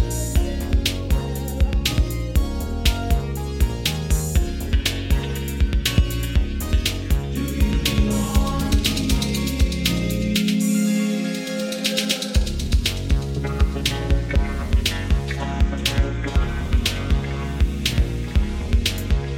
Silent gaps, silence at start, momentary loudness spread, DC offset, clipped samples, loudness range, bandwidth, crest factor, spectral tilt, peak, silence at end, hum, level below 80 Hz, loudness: none; 0 s; 4 LU; 0.1%; under 0.1%; 2 LU; 17 kHz; 16 dB; -5 dB/octave; -4 dBFS; 0 s; none; -22 dBFS; -22 LUFS